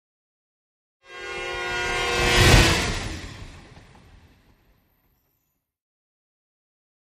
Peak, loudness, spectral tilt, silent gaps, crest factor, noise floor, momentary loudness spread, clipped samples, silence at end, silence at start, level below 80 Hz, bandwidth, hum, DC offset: -2 dBFS; -20 LUFS; -3.5 dB/octave; none; 24 dB; -75 dBFS; 24 LU; under 0.1%; 3.4 s; 1.1 s; -34 dBFS; 15.5 kHz; none; under 0.1%